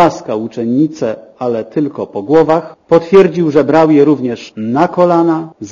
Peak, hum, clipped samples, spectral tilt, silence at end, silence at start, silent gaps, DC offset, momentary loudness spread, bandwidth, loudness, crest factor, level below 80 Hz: 0 dBFS; none; 0.7%; -7.5 dB/octave; 0 s; 0 s; none; under 0.1%; 11 LU; 7.4 kHz; -12 LUFS; 12 dB; -50 dBFS